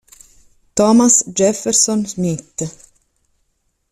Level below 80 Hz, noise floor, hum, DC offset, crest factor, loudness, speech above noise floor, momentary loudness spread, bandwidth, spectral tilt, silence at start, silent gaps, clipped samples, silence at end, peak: -54 dBFS; -66 dBFS; none; under 0.1%; 18 dB; -15 LUFS; 51 dB; 15 LU; 14 kHz; -4 dB/octave; 0.75 s; none; under 0.1%; 1.2 s; 0 dBFS